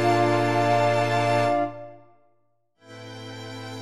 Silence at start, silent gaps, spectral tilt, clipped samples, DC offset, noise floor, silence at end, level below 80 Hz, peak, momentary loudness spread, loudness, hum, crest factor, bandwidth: 0 s; none; -6 dB/octave; under 0.1%; under 0.1%; -70 dBFS; 0 s; -68 dBFS; -10 dBFS; 20 LU; -22 LUFS; none; 14 dB; 13 kHz